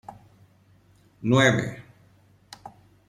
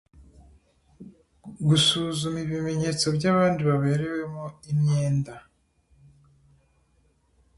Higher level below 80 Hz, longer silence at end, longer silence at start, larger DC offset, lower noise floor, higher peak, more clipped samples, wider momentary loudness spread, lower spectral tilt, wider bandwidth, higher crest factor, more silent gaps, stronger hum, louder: about the same, -60 dBFS vs -56 dBFS; second, 0.4 s vs 2.2 s; first, 1.2 s vs 0.2 s; neither; second, -58 dBFS vs -65 dBFS; about the same, -6 dBFS vs -8 dBFS; neither; first, 26 LU vs 11 LU; about the same, -5.5 dB/octave vs -5 dB/octave; about the same, 12.5 kHz vs 11.5 kHz; about the same, 22 dB vs 18 dB; neither; neither; about the same, -22 LUFS vs -24 LUFS